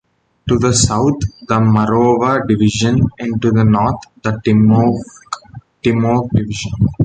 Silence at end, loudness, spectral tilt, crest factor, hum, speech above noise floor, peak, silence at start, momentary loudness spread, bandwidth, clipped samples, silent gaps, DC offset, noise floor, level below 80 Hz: 0 s; -14 LUFS; -6 dB/octave; 14 dB; none; 23 dB; 0 dBFS; 0.45 s; 10 LU; 9.4 kHz; under 0.1%; none; under 0.1%; -37 dBFS; -36 dBFS